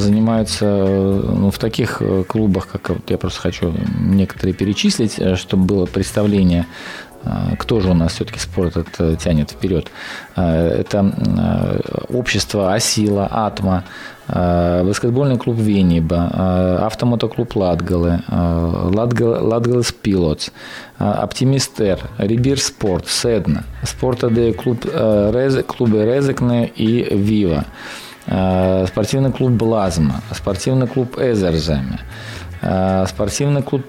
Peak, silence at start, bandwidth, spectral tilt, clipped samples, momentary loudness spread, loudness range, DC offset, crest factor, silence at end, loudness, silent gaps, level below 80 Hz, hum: -6 dBFS; 0 s; 16 kHz; -6 dB/octave; under 0.1%; 7 LU; 2 LU; under 0.1%; 12 dB; 0 s; -17 LUFS; none; -34 dBFS; none